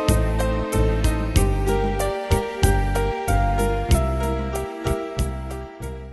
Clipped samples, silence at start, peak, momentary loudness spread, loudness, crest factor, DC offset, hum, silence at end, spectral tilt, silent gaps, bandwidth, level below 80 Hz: under 0.1%; 0 s; -4 dBFS; 7 LU; -23 LUFS; 18 dB; under 0.1%; none; 0 s; -6 dB/octave; none; 12.5 kHz; -24 dBFS